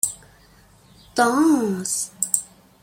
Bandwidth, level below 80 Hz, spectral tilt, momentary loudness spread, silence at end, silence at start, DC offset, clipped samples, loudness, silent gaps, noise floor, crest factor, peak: 16.5 kHz; -60 dBFS; -3 dB/octave; 9 LU; 0.35 s; 0.05 s; under 0.1%; under 0.1%; -21 LUFS; none; -52 dBFS; 24 dB; 0 dBFS